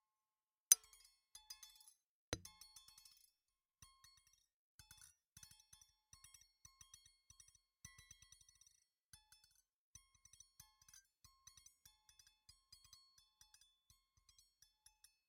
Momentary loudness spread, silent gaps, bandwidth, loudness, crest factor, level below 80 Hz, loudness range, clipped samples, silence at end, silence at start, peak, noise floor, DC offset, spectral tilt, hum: 17 LU; 2.06-2.32 s; 16.5 kHz; -39 LUFS; 42 dB; -78 dBFS; 25 LU; under 0.1%; 12.9 s; 0.7 s; -10 dBFS; under -90 dBFS; under 0.1%; 0.5 dB/octave; none